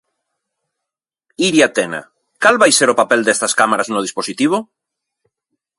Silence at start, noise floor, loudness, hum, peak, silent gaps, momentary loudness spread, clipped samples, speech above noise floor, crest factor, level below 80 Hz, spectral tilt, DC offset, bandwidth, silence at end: 1.4 s; -83 dBFS; -14 LUFS; none; 0 dBFS; none; 11 LU; under 0.1%; 69 dB; 18 dB; -64 dBFS; -2.5 dB/octave; under 0.1%; 11.5 kHz; 1.15 s